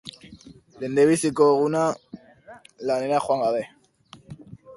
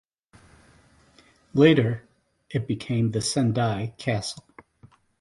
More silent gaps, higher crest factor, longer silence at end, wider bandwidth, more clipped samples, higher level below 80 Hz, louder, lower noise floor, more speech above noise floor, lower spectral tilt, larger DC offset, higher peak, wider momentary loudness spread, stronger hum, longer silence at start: neither; about the same, 18 dB vs 22 dB; second, 0 s vs 0.8 s; about the same, 11.5 kHz vs 11.5 kHz; neither; second, -64 dBFS vs -56 dBFS; about the same, -22 LUFS vs -24 LUFS; second, -52 dBFS vs -58 dBFS; second, 31 dB vs 35 dB; about the same, -5.5 dB/octave vs -6 dB/octave; neither; about the same, -6 dBFS vs -4 dBFS; first, 24 LU vs 14 LU; neither; second, 0.05 s vs 1.55 s